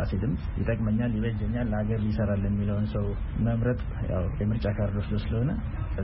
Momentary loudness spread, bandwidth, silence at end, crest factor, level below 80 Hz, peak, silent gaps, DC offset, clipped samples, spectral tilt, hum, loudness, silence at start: 4 LU; 5.6 kHz; 0 s; 12 dB; -34 dBFS; -14 dBFS; none; under 0.1%; under 0.1%; -8.5 dB/octave; none; -29 LUFS; 0 s